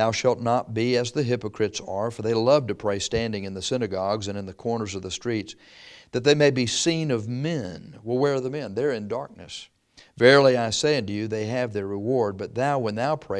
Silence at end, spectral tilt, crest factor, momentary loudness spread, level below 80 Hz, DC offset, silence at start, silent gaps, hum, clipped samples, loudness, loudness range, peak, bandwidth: 0 s; -4.5 dB/octave; 22 dB; 12 LU; -58 dBFS; under 0.1%; 0 s; none; none; under 0.1%; -24 LUFS; 6 LU; -2 dBFS; 11 kHz